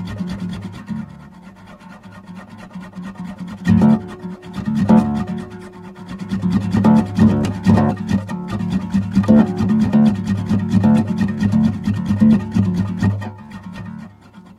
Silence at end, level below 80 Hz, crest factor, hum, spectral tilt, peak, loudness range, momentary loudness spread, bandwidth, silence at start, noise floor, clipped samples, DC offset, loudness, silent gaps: 0.15 s; -42 dBFS; 18 dB; none; -8.5 dB/octave; 0 dBFS; 6 LU; 21 LU; 10.5 kHz; 0 s; -42 dBFS; under 0.1%; under 0.1%; -17 LUFS; none